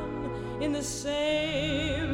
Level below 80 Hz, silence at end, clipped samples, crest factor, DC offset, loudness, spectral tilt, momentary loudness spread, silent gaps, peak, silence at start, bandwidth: -44 dBFS; 0 s; under 0.1%; 12 dB; under 0.1%; -30 LUFS; -4.5 dB/octave; 7 LU; none; -18 dBFS; 0 s; 16 kHz